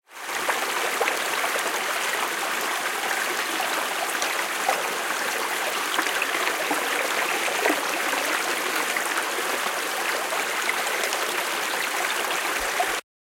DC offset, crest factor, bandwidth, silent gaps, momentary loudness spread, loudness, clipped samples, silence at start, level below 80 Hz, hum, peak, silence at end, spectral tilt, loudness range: under 0.1%; 20 dB; 17 kHz; none; 2 LU; -24 LUFS; under 0.1%; 0.1 s; -64 dBFS; none; -4 dBFS; 0.2 s; 0.5 dB/octave; 1 LU